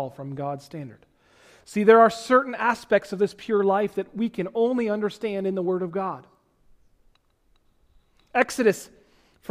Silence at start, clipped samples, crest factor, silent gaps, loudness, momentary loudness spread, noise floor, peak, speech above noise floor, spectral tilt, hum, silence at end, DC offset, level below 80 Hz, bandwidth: 0 s; under 0.1%; 22 dB; none; -23 LUFS; 16 LU; -64 dBFS; -4 dBFS; 41 dB; -5.5 dB/octave; none; 0.65 s; under 0.1%; -64 dBFS; 15.5 kHz